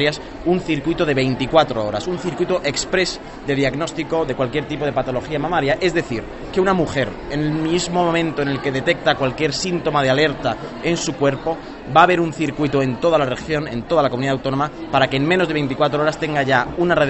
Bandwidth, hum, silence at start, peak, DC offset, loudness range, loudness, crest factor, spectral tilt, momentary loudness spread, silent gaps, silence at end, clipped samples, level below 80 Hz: 8.4 kHz; none; 0 s; 0 dBFS; under 0.1%; 3 LU; -19 LUFS; 18 dB; -5 dB/octave; 7 LU; none; 0 s; under 0.1%; -42 dBFS